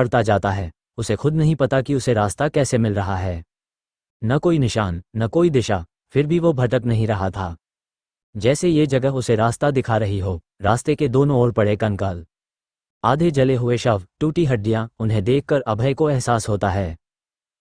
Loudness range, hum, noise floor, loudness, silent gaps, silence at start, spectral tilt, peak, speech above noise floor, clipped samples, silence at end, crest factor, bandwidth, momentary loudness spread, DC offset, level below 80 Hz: 2 LU; none; under -90 dBFS; -20 LUFS; 4.10-4.20 s, 8.23-8.33 s, 12.90-13.01 s; 0 s; -6.5 dB/octave; -2 dBFS; over 71 dB; under 0.1%; 0.65 s; 18 dB; 10.5 kHz; 8 LU; under 0.1%; -44 dBFS